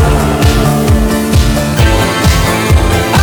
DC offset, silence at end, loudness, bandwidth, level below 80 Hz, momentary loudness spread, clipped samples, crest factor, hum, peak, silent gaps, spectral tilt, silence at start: under 0.1%; 0 s; -10 LUFS; over 20 kHz; -14 dBFS; 1 LU; 0.3%; 8 dB; none; 0 dBFS; none; -5.5 dB/octave; 0 s